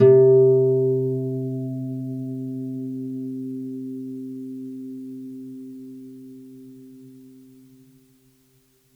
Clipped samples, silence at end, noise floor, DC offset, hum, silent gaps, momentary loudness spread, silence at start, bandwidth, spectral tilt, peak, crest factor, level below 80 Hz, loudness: under 0.1%; 1.65 s; -61 dBFS; under 0.1%; none; none; 26 LU; 0 s; 3 kHz; -11 dB/octave; -6 dBFS; 18 dB; -74 dBFS; -23 LUFS